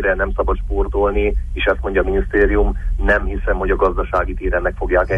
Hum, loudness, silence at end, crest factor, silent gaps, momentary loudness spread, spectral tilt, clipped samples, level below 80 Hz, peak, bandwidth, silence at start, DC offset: none; -18 LUFS; 0 s; 14 dB; none; 5 LU; -8 dB/octave; under 0.1%; -22 dBFS; -4 dBFS; 3.7 kHz; 0 s; under 0.1%